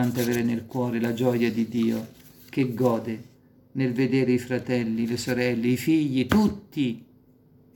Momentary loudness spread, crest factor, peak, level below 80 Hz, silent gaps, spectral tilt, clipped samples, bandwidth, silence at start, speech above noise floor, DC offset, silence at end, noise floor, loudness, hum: 8 LU; 18 dB; -8 dBFS; -56 dBFS; none; -6.5 dB/octave; under 0.1%; 17.5 kHz; 0 s; 32 dB; under 0.1%; 0.75 s; -57 dBFS; -25 LUFS; none